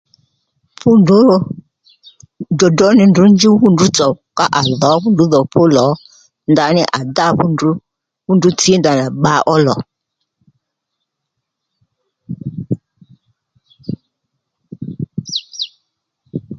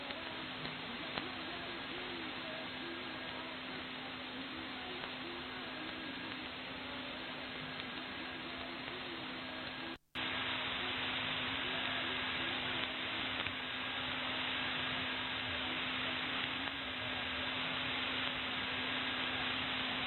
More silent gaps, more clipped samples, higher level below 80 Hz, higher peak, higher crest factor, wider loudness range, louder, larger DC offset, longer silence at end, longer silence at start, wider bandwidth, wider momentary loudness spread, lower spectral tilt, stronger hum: neither; neither; first, -50 dBFS vs -64 dBFS; first, 0 dBFS vs -18 dBFS; second, 14 dB vs 24 dB; first, 19 LU vs 6 LU; first, -12 LUFS vs -39 LUFS; neither; about the same, 0 s vs 0 s; first, 0.85 s vs 0 s; second, 9.2 kHz vs 16 kHz; first, 20 LU vs 7 LU; about the same, -5.5 dB/octave vs -5.5 dB/octave; neither